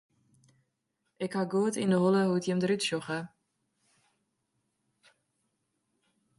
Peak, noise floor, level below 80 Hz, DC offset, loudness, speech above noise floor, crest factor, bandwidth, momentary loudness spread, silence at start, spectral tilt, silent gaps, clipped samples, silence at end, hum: -14 dBFS; -81 dBFS; -76 dBFS; under 0.1%; -29 LUFS; 52 dB; 18 dB; 11.5 kHz; 12 LU; 1.2 s; -5.5 dB/octave; none; under 0.1%; 3.1 s; none